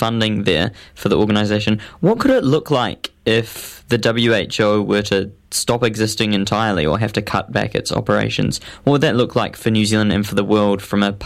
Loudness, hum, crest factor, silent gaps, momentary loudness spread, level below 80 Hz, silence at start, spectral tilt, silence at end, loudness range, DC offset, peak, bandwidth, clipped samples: -17 LUFS; none; 16 dB; none; 6 LU; -44 dBFS; 0 s; -5 dB/octave; 0 s; 1 LU; under 0.1%; 0 dBFS; 15.5 kHz; under 0.1%